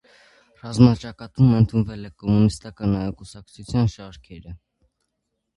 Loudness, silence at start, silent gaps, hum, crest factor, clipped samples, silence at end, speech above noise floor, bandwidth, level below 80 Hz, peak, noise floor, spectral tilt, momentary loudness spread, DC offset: -21 LUFS; 0.65 s; none; none; 22 dB; under 0.1%; 1 s; 57 dB; 11.5 kHz; -44 dBFS; 0 dBFS; -77 dBFS; -8 dB/octave; 24 LU; under 0.1%